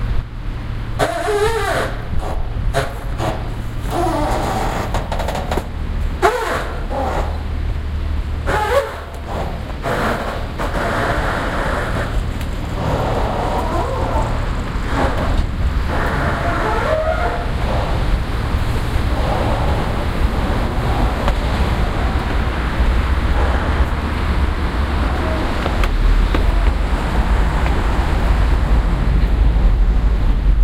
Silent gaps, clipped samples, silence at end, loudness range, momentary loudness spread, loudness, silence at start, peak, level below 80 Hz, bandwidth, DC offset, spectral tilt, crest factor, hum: none; under 0.1%; 0 s; 3 LU; 7 LU; -20 LUFS; 0 s; 0 dBFS; -20 dBFS; 15 kHz; under 0.1%; -6.5 dB/octave; 16 dB; none